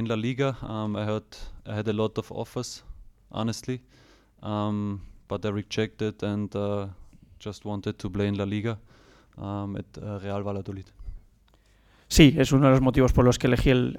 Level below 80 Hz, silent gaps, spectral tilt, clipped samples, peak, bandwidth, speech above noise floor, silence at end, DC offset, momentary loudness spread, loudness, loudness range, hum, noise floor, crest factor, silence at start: -40 dBFS; none; -6 dB/octave; under 0.1%; -2 dBFS; 17 kHz; 35 dB; 0 s; under 0.1%; 20 LU; -26 LUFS; 11 LU; none; -60 dBFS; 24 dB; 0 s